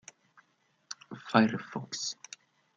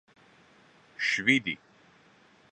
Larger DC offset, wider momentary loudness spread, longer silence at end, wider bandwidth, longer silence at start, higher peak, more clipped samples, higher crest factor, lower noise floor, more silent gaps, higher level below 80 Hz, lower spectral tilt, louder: neither; about the same, 20 LU vs 18 LU; second, 0.65 s vs 0.95 s; second, 7.8 kHz vs 10.5 kHz; about the same, 0.9 s vs 1 s; about the same, -8 dBFS vs -8 dBFS; neither; about the same, 26 dB vs 26 dB; first, -72 dBFS vs -60 dBFS; neither; about the same, -78 dBFS vs -74 dBFS; about the same, -4 dB/octave vs -3.5 dB/octave; second, -30 LUFS vs -27 LUFS